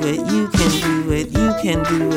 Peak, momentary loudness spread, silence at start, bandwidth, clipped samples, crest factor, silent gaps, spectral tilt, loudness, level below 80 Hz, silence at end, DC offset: -2 dBFS; 3 LU; 0 s; 16.5 kHz; under 0.1%; 14 dB; none; -5 dB/octave; -18 LUFS; -32 dBFS; 0 s; under 0.1%